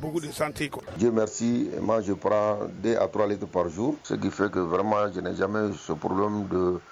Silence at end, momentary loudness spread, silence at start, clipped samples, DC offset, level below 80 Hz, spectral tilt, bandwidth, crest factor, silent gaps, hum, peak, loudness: 0 s; 5 LU; 0 s; under 0.1%; under 0.1%; -58 dBFS; -6 dB/octave; 14 kHz; 16 dB; none; none; -10 dBFS; -27 LUFS